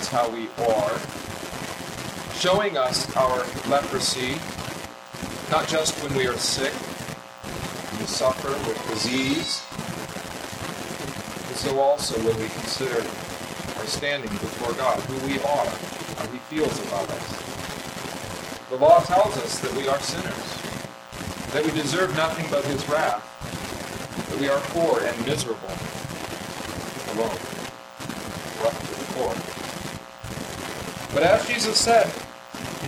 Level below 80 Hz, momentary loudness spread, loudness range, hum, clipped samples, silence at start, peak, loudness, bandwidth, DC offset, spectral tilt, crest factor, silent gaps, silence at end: -52 dBFS; 12 LU; 7 LU; none; under 0.1%; 0 s; -4 dBFS; -25 LUFS; 16.5 kHz; under 0.1%; -3.5 dB/octave; 22 dB; none; 0 s